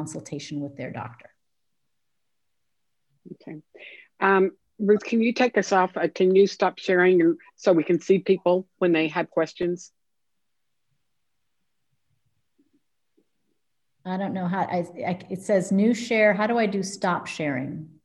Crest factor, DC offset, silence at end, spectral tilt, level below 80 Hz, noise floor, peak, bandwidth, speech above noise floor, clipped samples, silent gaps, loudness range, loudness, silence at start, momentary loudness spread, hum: 20 dB; under 0.1%; 0.2 s; -6 dB/octave; -72 dBFS; -83 dBFS; -6 dBFS; 11.5 kHz; 60 dB; under 0.1%; none; 17 LU; -23 LUFS; 0 s; 15 LU; none